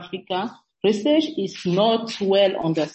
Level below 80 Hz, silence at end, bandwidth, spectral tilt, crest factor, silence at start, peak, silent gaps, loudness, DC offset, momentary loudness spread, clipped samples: -66 dBFS; 0.05 s; 8.4 kHz; -6 dB/octave; 14 dB; 0 s; -6 dBFS; none; -21 LUFS; under 0.1%; 9 LU; under 0.1%